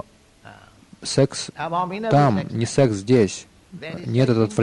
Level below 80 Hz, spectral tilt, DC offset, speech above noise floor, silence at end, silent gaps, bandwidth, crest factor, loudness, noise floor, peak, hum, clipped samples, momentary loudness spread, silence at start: -54 dBFS; -6 dB/octave; under 0.1%; 28 dB; 0 s; none; 11 kHz; 16 dB; -20 LUFS; -48 dBFS; -4 dBFS; none; under 0.1%; 15 LU; 0.45 s